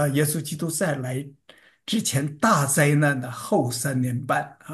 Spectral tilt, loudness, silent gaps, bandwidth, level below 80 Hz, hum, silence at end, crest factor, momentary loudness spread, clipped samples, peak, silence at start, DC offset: -4.5 dB/octave; -23 LUFS; none; 13 kHz; -64 dBFS; none; 0 s; 18 dB; 10 LU; under 0.1%; -6 dBFS; 0 s; under 0.1%